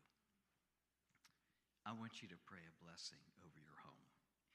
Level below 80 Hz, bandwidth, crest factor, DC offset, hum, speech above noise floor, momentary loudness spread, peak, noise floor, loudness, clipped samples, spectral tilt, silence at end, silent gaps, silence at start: under -90 dBFS; 11.5 kHz; 26 dB; under 0.1%; none; over 32 dB; 14 LU; -36 dBFS; under -90 dBFS; -57 LUFS; under 0.1%; -3.5 dB/octave; 0 s; none; 0 s